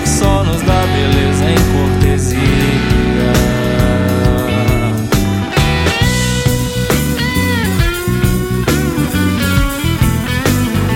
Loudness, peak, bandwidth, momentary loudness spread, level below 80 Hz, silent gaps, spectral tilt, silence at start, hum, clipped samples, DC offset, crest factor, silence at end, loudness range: -13 LUFS; 0 dBFS; 17 kHz; 3 LU; -20 dBFS; none; -5.5 dB/octave; 0 s; none; under 0.1%; under 0.1%; 12 dB; 0 s; 2 LU